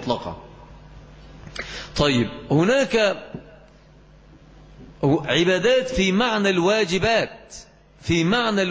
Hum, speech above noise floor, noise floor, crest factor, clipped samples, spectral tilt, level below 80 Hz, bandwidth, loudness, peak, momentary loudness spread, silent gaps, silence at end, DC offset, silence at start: none; 29 dB; -49 dBFS; 16 dB; under 0.1%; -5 dB/octave; -44 dBFS; 8 kHz; -21 LUFS; -6 dBFS; 18 LU; none; 0 s; under 0.1%; 0 s